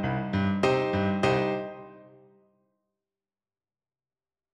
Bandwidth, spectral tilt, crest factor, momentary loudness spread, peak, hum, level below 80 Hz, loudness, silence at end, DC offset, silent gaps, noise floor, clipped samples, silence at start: 10 kHz; -7 dB/octave; 20 dB; 11 LU; -10 dBFS; none; -56 dBFS; -27 LUFS; 2.45 s; under 0.1%; none; under -90 dBFS; under 0.1%; 0 s